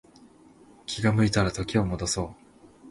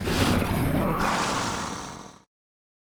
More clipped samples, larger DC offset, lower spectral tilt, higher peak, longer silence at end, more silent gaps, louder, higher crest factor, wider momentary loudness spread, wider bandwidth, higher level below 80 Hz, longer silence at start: neither; neither; about the same, -5 dB/octave vs -4.5 dB/octave; about the same, -10 dBFS vs -10 dBFS; second, 0 s vs 0.85 s; neither; about the same, -26 LUFS vs -26 LUFS; about the same, 18 dB vs 18 dB; about the same, 13 LU vs 13 LU; second, 11.5 kHz vs over 20 kHz; second, -46 dBFS vs -38 dBFS; first, 0.9 s vs 0 s